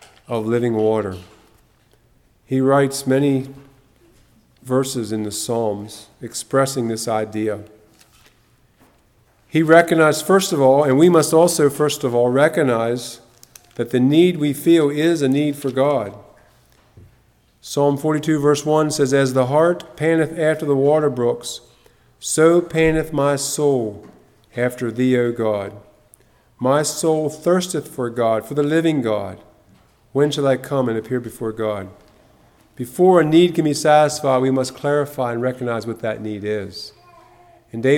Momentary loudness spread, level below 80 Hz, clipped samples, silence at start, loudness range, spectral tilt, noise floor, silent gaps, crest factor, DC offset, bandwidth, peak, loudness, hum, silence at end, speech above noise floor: 13 LU; -52 dBFS; under 0.1%; 0.3 s; 7 LU; -5.5 dB/octave; -57 dBFS; none; 18 dB; under 0.1%; 17.5 kHz; 0 dBFS; -18 LUFS; none; 0 s; 39 dB